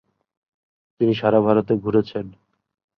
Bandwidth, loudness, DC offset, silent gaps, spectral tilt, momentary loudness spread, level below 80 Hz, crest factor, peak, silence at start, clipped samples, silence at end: 6 kHz; -20 LUFS; under 0.1%; none; -9.5 dB/octave; 13 LU; -56 dBFS; 20 dB; -4 dBFS; 1 s; under 0.1%; 0.7 s